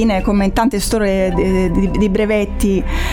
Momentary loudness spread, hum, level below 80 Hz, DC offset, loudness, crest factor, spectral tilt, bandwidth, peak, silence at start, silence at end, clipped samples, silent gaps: 2 LU; none; -22 dBFS; under 0.1%; -16 LUFS; 12 dB; -6 dB/octave; 17.5 kHz; -2 dBFS; 0 s; 0 s; under 0.1%; none